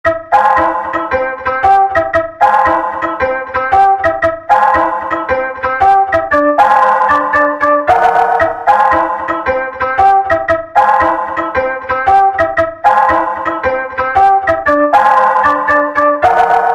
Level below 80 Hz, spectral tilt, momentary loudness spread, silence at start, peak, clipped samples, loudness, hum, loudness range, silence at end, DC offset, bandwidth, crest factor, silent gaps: -40 dBFS; -5.5 dB/octave; 7 LU; 0.05 s; 0 dBFS; under 0.1%; -11 LUFS; none; 2 LU; 0 s; under 0.1%; 9.4 kHz; 10 dB; none